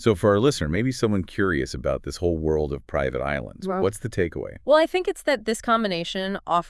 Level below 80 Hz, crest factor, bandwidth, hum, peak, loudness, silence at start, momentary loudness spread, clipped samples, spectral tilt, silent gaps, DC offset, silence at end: -42 dBFS; 18 dB; 12 kHz; none; -6 dBFS; -24 LUFS; 0 s; 8 LU; under 0.1%; -5.5 dB/octave; none; under 0.1%; 0 s